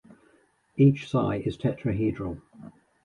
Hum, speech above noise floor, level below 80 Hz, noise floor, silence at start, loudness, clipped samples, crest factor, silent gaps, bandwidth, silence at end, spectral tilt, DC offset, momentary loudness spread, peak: none; 39 dB; -52 dBFS; -64 dBFS; 0.75 s; -26 LUFS; under 0.1%; 18 dB; none; 7 kHz; 0.35 s; -9 dB/octave; under 0.1%; 15 LU; -10 dBFS